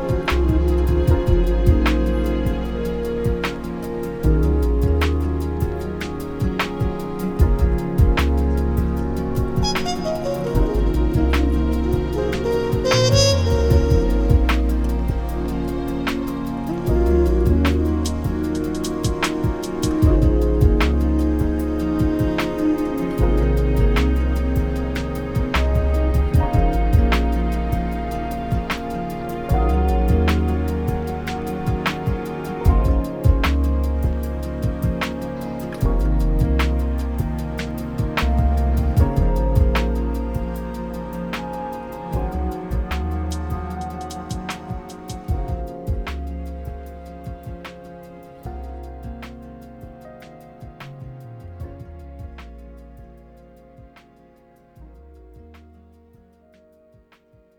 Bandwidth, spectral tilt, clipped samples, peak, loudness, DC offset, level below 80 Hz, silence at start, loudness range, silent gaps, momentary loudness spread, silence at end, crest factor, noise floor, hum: 17.5 kHz; -6.5 dB/octave; under 0.1%; -2 dBFS; -21 LUFS; under 0.1%; -22 dBFS; 0 s; 16 LU; none; 17 LU; 2 s; 18 dB; -55 dBFS; none